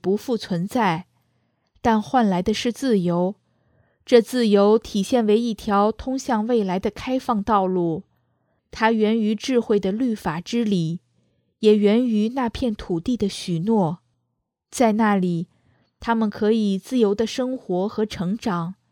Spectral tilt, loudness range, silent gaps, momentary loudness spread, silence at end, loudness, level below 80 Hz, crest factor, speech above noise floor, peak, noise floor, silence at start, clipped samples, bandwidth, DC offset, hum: -6 dB/octave; 3 LU; none; 9 LU; 0.2 s; -21 LUFS; -50 dBFS; 20 dB; 56 dB; -2 dBFS; -76 dBFS; 0.05 s; under 0.1%; 14.5 kHz; under 0.1%; none